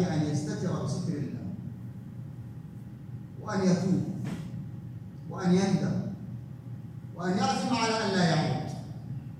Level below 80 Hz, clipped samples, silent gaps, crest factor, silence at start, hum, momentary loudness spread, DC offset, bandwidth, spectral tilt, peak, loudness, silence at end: -60 dBFS; under 0.1%; none; 18 dB; 0 s; none; 17 LU; under 0.1%; 11 kHz; -6 dB/octave; -14 dBFS; -30 LUFS; 0 s